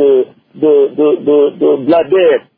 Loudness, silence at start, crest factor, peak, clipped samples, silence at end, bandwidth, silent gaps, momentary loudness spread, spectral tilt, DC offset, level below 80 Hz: -11 LUFS; 0 s; 10 dB; 0 dBFS; under 0.1%; 0.2 s; 4.4 kHz; none; 4 LU; -10 dB/octave; under 0.1%; -60 dBFS